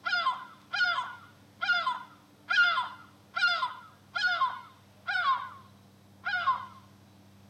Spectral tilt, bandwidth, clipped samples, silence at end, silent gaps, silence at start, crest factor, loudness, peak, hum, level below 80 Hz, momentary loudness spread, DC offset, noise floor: -1.5 dB/octave; 14 kHz; under 0.1%; 0.7 s; none; 0.05 s; 18 dB; -30 LUFS; -14 dBFS; none; -82 dBFS; 16 LU; under 0.1%; -57 dBFS